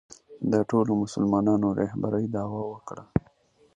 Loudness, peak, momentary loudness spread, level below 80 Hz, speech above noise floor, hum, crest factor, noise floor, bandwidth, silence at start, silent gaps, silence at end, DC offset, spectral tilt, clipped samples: -27 LUFS; -8 dBFS; 10 LU; -52 dBFS; 36 dB; none; 20 dB; -61 dBFS; 10 kHz; 0.3 s; none; 0.6 s; under 0.1%; -8 dB/octave; under 0.1%